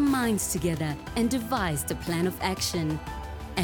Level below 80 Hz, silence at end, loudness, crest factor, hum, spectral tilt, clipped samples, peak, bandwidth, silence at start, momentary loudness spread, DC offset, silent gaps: -44 dBFS; 0 s; -28 LUFS; 16 dB; none; -4.5 dB/octave; under 0.1%; -12 dBFS; 17.5 kHz; 0 s; 7 LU; under 0.1%; none